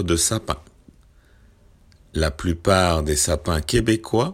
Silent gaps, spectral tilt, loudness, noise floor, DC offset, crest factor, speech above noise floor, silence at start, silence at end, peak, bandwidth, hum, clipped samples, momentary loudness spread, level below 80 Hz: none; -4 dB/octave; -21 LUFS; -53 dBFS; under 0.1%; 20 dB; 32 dB; 0 s; 0 s; -2 dBFS; 16.5 kHz; none; under 0.1%; 9 LU; -36 dBFS